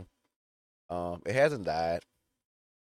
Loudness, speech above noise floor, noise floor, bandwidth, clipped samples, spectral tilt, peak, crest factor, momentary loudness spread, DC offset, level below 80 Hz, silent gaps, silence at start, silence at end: -31 LUFS; over 60 dB; under -90 dBFS; 13.5 kHz; under 0.1%; -5.5 dB/octave; -14 dBFS; 20 dB; 11 LU; under 0.1%; -62 dBFS; 0.36-0.89 s; 0 s; 0.85 s